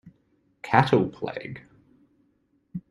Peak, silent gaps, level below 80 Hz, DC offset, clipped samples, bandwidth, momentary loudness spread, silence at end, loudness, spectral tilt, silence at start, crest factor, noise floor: -2 dBFS; none; -60 dBFS; under 0.1%; under 0.1%; 11 kHz; 22 LU; 0.1 s; -24 LUFS; -7.5 dB/octave; 0.05 s; 26 dB; -68 dBFS